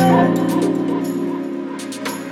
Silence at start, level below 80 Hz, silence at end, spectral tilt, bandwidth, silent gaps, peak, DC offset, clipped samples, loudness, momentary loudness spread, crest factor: 0 s; -58 dBFS; 0 s; -6.5 dB/octave; 15.5 kHz; none; -2 dBFS; under 0.1%; under 0.1%; -20 LUFS; 11 LU; 16 dB